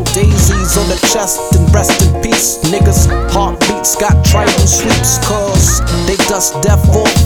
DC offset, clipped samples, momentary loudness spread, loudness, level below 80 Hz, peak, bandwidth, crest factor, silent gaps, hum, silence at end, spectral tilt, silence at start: under 0.1%; under 0.1%; 3 LU; -10 LUFS; -16 dBFS; 0 dBFS; 19 kHz; 10 dB; none; none; 0 s; -4 dB/octave; 0 s